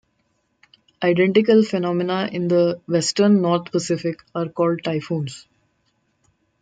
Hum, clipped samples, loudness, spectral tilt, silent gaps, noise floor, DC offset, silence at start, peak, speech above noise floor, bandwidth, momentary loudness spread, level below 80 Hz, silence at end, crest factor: none; under 0.1%; -20 LUFS; -5.5 dB/octave; none; -68 dBFS; under 0.1%; 1 s; -4 dBFS; 49 dB; 9.2 kHz; 11 LU; -66 dBFS; 1.2 s; 18 dB